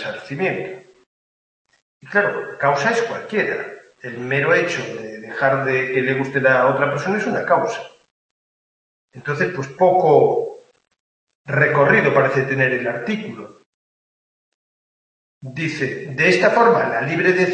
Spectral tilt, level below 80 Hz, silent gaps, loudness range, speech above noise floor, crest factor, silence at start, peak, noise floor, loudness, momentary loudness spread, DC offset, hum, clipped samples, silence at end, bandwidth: -6 dB/octave; -64 dBFS; 1.06-1.65 s, 1.82-2.00 s, 8.11-9.08 s, 11.00-11.27 s, 11.35-11.45 s, 13.66-15.41 s; 5 LU; over 72 dB; 18 dB; 0 s; -2 dBFS; under -90 dBFS; -18 LUFS; 16 LU; under 0.1%; none; under 0.1%; 0 s; 8.8 kHz